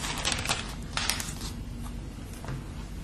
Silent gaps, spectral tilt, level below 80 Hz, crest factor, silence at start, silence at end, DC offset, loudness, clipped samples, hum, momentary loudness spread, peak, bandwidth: none; -2.5 dB/octave; -40 dBFS; 30 dB; 0 s; 0 s; under 0.1%; -33 LUFS; under 0.1%; none; 12 LU; -4 dBFS; 13 kHz